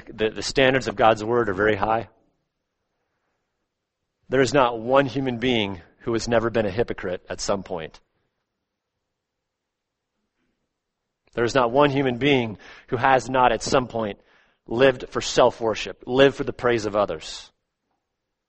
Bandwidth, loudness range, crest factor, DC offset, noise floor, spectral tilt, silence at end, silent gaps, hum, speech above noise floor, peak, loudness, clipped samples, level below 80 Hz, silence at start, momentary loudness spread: 8.4 kHz; 9 LU; 22 dB; under 0.1%; -82 dBFS; -5 dB/octave; 1.05 s; none; none; 60 dB; -2 dBFS; -22 LUFS; under 0.1%; -48 dBFS; 0.1 s; 12 LU